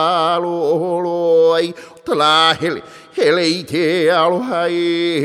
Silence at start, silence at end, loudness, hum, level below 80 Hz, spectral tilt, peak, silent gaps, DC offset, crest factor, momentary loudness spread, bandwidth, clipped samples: 0 s; 0 s; -15 LUFS; none; -64 dBFS; -4.5 dB/octave; -2 dBFS; none; under 0.1%; 14 dB; 10 LU; 13.5 kHz; under 0.1%